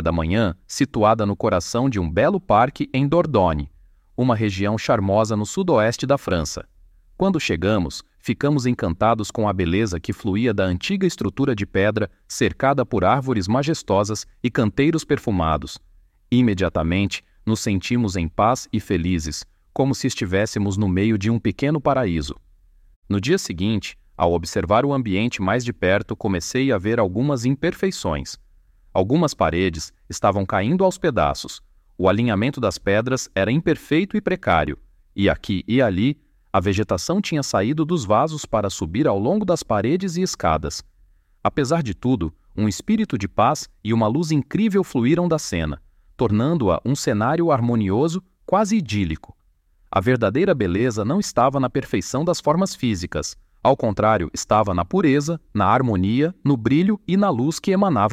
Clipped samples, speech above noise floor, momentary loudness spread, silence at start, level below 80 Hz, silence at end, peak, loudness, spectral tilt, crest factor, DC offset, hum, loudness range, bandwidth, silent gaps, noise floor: under 0.1%; 38 dB; 7 LU; 0 s; -42 dBFS; 0 s; -4 dBFS; -21 LUFS; -6 dB/octave; 18 dB; under 0.1%; none; 3 LU; 15.5 kHz; 22.96-23.02 s; -58 dBFS